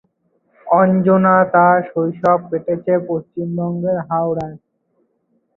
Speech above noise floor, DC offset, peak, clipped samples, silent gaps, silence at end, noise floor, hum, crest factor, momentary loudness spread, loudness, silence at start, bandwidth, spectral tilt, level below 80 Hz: 49 dB; under 0.1%; -2 dBFS; under 0.1%; none; 1 s; -65 dBFS; none; 16 dB; 11 LU; -16 LUFS; 0.65 s; 3.1 kHz; -10.5 dB/octave; -58 dBFS